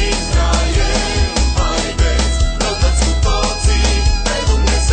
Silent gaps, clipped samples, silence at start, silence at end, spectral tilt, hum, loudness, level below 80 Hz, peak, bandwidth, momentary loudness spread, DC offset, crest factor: none; under 0.1%; 0 s; 0 s; -4 dB/octave; none; -16 LUFS; -16 dBFS; 0 dBFS; 9.2 kHz; 2 LU; under 0.1%; 12 dB